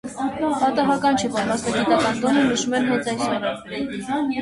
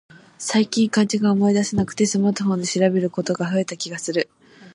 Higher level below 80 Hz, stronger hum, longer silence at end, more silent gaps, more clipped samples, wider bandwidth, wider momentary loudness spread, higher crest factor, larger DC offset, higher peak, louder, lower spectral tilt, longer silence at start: about the same, -54 dBFS vs -56 dBFS; neither; about the same, 0 s vs 0.05 s; neither; neither; about the same, 11.5 kHz vs 11 kHz; about the same, 8 LU vs 7 LU; about the same, 16 dB vs 16 dB; neither; about the same, -6 dBFS vs -6 dBFS; about the same, -21 LUFS vs -21 LUFS; about the same, -4 dB/octave vs -5 dB/octave; second, 0.05 s vs 0.4 s